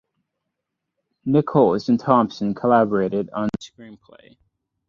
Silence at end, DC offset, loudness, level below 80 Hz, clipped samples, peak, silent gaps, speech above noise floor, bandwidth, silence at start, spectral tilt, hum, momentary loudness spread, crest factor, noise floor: 0.95 s; under 0.1%; -20 LUFS; -58 dBFS; under 0.1%; -2 dBFS; none; 61 dB; 7.4 kHz; 1.25 s; -8 dB/octave; none; 11 LU; 18 dB; -81 dBFS